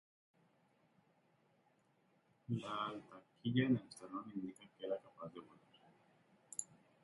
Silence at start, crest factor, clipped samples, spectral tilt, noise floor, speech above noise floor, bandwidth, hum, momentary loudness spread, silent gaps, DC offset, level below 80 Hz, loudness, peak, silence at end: 2.5 s; 24 dB; under 0.1%; -5.5 dB/octave; -76 dBFS; 35 dB; 11 kHz; none; 18 LU; none; under 0.1%; -82 dBFS; -43 LUFS; -22 dBFS; 0.4 s